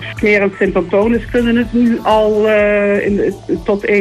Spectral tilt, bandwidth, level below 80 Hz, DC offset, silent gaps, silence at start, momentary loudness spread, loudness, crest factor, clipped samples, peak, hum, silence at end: -7 dB/octave; 13 kHz; -34 dBFS; under 0.1%; none; 0 s; 5 LU; -13 LUFS; 10 dB; under 0.1%; -2 dBFS; none; 0 s